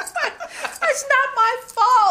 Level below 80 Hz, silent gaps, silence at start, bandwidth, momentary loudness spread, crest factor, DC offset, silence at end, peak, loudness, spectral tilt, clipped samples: -64 dBFS; none; 0 s; 16 kHz; 11 LU; 16 dB; under 0.1%; 0 s; -4 dBFS; -19 LUFS; 1 dB/octave; under 0.1%